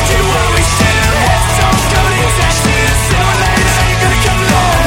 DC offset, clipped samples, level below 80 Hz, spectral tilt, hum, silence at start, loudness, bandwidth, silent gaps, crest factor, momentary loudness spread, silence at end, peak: under 0.1%; under 0.1%; -18 dBFS; -4 dB/octave; none; 0 s; -10 LUFS; 16.5 kHz; none; 10 dB; 1 LU; 0 s; 0 dBFS